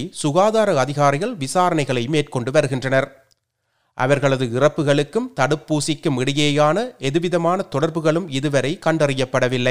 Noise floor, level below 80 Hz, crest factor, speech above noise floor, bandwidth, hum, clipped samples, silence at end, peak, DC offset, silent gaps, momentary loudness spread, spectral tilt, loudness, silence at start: -71 dBFS; -54 dBFS; 18 dB; 52 dB; 15.5 kHz; none; under 0.1%; 0 s; 0 dBFS; 0.8%; none; 5 LU; -5.5 dB/octave; -19 LUFS; 0 s